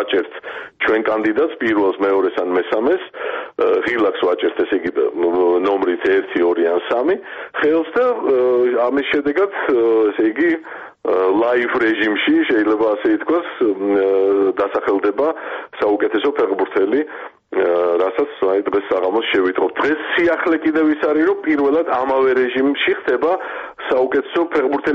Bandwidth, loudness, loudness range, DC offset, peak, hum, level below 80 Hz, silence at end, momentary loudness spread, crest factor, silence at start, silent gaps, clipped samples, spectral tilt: 6 kHz; -17 LUFS; 2 LU; under 0.1%; -6 dBFS; none; -58 dBFS; 0 s; 5 LU; 10 dB; 0 s; none; under 0.1%; -6.5 dB/octave